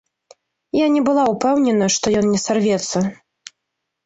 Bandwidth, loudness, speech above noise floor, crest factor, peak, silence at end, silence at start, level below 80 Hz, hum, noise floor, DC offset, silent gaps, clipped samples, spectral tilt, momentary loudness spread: 8.2 kHz; -18 LUFS; 61 dB; 14 dB; -4 dBFS; 0.9 s; 0.75 s; -54 dBFS; none; -78 dBFS; under 0.1%; none; under 0.1%; -4.5 dB/octave; 6 LU